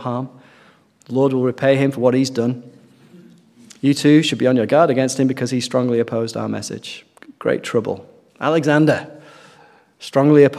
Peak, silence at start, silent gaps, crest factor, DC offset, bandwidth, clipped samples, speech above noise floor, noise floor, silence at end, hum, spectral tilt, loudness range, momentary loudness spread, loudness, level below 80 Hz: 0 dBFS; 0 s; none; 18 dB; under 0.1%; 14 kHz; under 0.1%; 35 dB; -52 dBFS; 0 s; none; -6 dB/octave; 4 LU; 15 LU; -18 LUFS; -64 dBFS